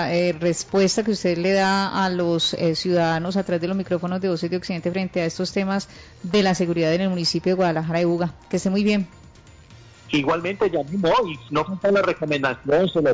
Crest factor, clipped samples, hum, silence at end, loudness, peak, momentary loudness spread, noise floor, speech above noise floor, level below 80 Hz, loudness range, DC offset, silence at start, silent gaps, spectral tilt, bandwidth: 10 dB; under 0.1%; none; 0 s; -22 LUFS; -10 dBFS; 6 LU; -47 dBFS; 26 dB; -52 dBFS; 3 LU; under 0.1%; 0 s; none; -5.5 dB/octave; 8 kHz